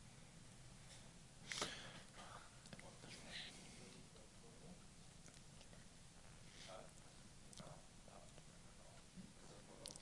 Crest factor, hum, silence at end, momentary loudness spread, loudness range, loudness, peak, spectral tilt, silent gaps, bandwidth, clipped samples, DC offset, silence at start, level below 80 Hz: 32 dB; none; 0 s; 11 LU; 8 LU; -57 LUFS; -28 dBFS; -2.5 dB/octave; none; 11.5 kHz; under 0.1%; under 0.1%; 0 s; -70 dBFS